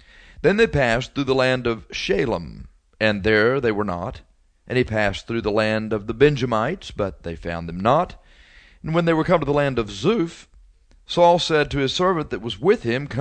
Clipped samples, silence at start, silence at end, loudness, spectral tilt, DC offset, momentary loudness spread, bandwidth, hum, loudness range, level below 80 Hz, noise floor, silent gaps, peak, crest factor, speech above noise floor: under 0.1%; 0.4 s; 0 s; -21 LUFS; -6 dB/octave; under 0.1%; 10 LU; 9.2 kHz; none; 2 LU; -42 dBFS; -52 dBFS; none; -2 dBFS; 20 dB; 31 dB